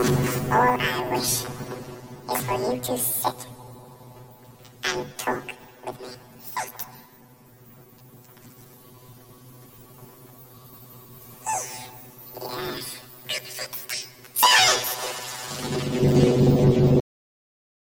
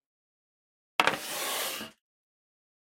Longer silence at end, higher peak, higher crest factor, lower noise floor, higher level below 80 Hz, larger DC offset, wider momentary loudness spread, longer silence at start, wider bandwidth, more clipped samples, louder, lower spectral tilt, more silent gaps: about the same, 1 s vs 1 s; about the same, -4 dBFS vs -2 dBFS; second, 22 dB vs 32 dB; second, -52 dBFS vs under -90 dBFS; first, -50 dBFS vs -78 dBFS; neither; first, 23 LU vs 11 LU; second, 0 s vs 1 s; about the same, 17 kHz vs 16.5 kHz; neither; first, -23 LUFS vs -30 LUFS; first, -4 dB/octave vs -0.5 dB/octave; neither